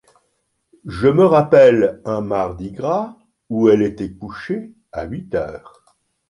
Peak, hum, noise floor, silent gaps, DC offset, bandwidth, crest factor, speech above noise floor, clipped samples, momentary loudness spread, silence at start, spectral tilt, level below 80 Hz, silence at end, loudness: -2 dBFS; none; -69 dBFS; none; under 0.1%; 11 kHz; 16 dB; 52 dB; under 0.1%; 20 LU; 0.85 s; -8 dB/octave; -46 dBFS; 0.7 s; -17 LUFS